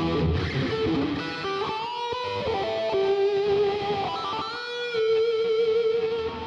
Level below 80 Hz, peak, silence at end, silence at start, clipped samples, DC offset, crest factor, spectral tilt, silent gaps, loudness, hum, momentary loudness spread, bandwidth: -48 dBFS; -14 dBFS; 0 s; 0 s; under 0.1%; under 0.1%; 12 dB; -6.5 dB/octave; none; -26 LUFS; none; 6 LU; 7.6 kHz